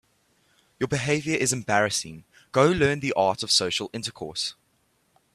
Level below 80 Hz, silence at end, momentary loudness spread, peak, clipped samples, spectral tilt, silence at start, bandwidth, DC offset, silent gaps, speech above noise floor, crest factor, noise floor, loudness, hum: -56 dBFS; 0.85 s; 11 LU; -4 dBFS; under 0.1%; -3.5 dB/octave; 0.8 s; 14 kHz; under 0.1%; none; 43 dB; 22 dB; -68 dBFS; -24 LUFS; none